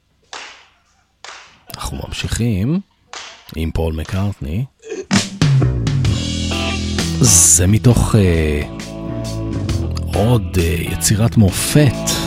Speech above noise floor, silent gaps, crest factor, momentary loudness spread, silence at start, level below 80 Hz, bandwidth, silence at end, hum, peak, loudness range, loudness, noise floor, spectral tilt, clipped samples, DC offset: 43 dB; none; 16 dB; 20 LU; 0.35 s; -28 dBFS; 16.5 kHz; 0 s; none; 0 dBFS; 10 LU; -16 LUFS; -58 dBFS; -4.5 dB/octave; under 0.1%; under 0.1%